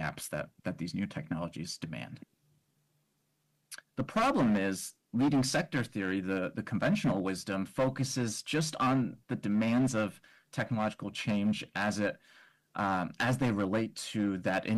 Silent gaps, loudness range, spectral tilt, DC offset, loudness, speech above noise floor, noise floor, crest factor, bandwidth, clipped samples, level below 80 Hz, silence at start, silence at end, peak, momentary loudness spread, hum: none; 8 LU; -5.5 dB/octave; under 0.1%; -32 LUFS; 45 dB; -77 dBFS; 12 dB; 12.5 kHz; under 0.1%; -64 dBFS; 0 s; 0 s; -22 dBFS; 11 LU; none